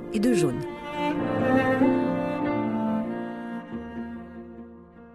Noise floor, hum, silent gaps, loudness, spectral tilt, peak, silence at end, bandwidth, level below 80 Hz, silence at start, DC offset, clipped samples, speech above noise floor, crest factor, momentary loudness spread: -47 dBFS; none; none; -26 LUFS; -6.5 dB/octave; -8 dBFS; 0 s; 13 kHz; -54 dBFS; 0 s; under 0.1%; under 0.1%; 24 dB; 18 dB; 18 LU